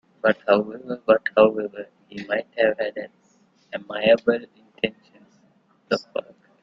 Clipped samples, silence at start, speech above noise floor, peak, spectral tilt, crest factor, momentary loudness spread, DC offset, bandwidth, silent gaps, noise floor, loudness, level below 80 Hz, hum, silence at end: under 0.1%; 0.25 s; 39 dB; -2 dBFS; -6 dB/octave; 22 dB; 18 LU; under 0.1%; 7.4 kHz; none; -61 dBFS; -23 LUFS; -66 dBFS; none; 0.4 s